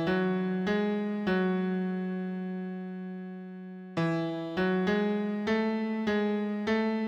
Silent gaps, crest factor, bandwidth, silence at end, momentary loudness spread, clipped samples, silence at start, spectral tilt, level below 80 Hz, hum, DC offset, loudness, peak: none; 12 dB; 7.4 kHz; 0 s; 11 LU; under 0.1%; 0 s; -8 dB/octave; -64 dBFS; none; under 0.1%; -30 LUFS; -16 dBFS